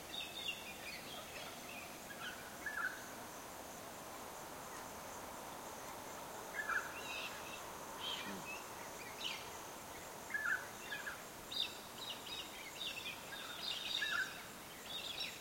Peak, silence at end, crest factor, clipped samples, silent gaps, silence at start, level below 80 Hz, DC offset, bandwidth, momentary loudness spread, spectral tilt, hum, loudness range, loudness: -28 dBFS; 0 s; 20 dB; under 0.1%; none; 0 s; -72 dBFS; under 0.1%; 16.5 kHz; 10 LU; -1 dB/octave; none; 5 LU; -45 LUFS